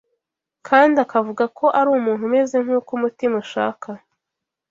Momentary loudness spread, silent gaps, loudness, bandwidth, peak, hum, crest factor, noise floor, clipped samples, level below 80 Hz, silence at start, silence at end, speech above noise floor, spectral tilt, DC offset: 10 LU; none; -19 LUFS; 7.6 kHz; -2 dBFS; none; 18 dB; -83 dBFS; under 0.1%; -70 dBFS; 0.65 s; 0.75 s; 65 dB; -5.5 dB/octave; under 0.1%